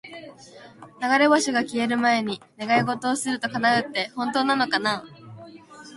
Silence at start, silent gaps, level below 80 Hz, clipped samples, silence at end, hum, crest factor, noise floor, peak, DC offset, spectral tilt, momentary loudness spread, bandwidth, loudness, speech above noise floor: 0.05 s; none; -68 dBFS; under 0.1%; 0 s; none; 18 dB; -45 dBFS; -6 dBFS; under 0.1%; -3.5 dB/octave; 13 LU; 11.5 kHz; -23 LUFS; 21 dB